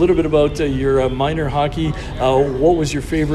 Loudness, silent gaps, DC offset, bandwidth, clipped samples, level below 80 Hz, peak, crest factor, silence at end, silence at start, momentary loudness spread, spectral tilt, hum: -17 LUFS; none; under 0.1%; 13 kHz; under 0.1%; -30 dBFS; -2 dBFS; 14 dB; 0 s; 0 s; 5 LU; -6.5 dB/octave; none